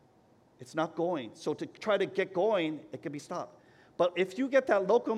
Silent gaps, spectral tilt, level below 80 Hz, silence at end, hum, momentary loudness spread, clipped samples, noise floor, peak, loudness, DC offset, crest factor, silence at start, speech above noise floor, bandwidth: none; -5.5 dB/octave; -80 dBFS; 0 s; none; 14 LU; under 0.1%; -64 dBFS; -14 dBFS; -31 LUFS; under 0.1%; 18 dB; 0.6 s; 33 dB; 12 kHz